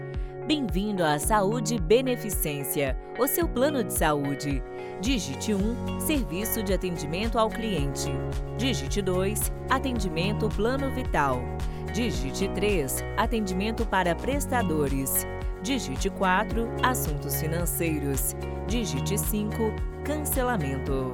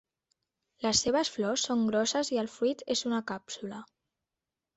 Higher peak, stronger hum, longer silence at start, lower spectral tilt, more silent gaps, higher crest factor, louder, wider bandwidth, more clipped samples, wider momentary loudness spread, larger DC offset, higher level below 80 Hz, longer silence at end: first, -6 dBFS vs -14 dBFS; neither; second, 0 s vs 0.8 s; first, -4.5 dB/octave vs -3 dB/octave; neither; about the same, 20 dB vs 18 dB; first, -27 LUFS vs -30 LUFS; first, over 20 kHz vs 8.4 kHz; neither; second, 6 LU vs 13 LU; neither; first, -36 dBFS vs -64 dBFS; second, 0 s vs 0.95 s